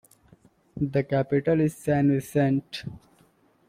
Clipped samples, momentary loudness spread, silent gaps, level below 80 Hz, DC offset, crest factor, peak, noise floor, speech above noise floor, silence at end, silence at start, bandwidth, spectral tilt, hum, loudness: under 0.1%; 14 LU; none; -56 dBFS; under 0.1%; 16 dB; -12 dBFS; -62 dBFS; 37 dB; 0.7 s; 0.75 s; 15.5 kHz; -7.5 dB/octave; none; -25 LUFS